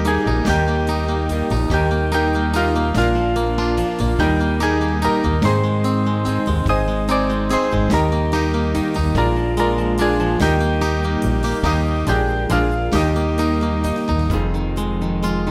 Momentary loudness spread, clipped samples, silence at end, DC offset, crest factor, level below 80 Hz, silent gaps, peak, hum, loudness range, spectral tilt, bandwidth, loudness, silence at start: 3 LU; under 0.1%; 0 s; under 0.1%; 14 dB; -24 dBFS; none; -4 dBFS; none; 1 LU; -6.5 dB/octave; 14.5 kHz; -19 LUFS; 0 s